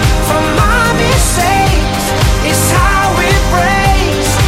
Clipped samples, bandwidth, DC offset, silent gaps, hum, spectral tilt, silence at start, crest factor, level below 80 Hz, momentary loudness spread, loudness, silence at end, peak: under 0.1%; 16.5 kHz; under 0.1%; none; none; -4 dB/octave; 0 s; 10 dB; -16 dBFS; 2 LU; -11 LUFS; 0 s; 0 dBFS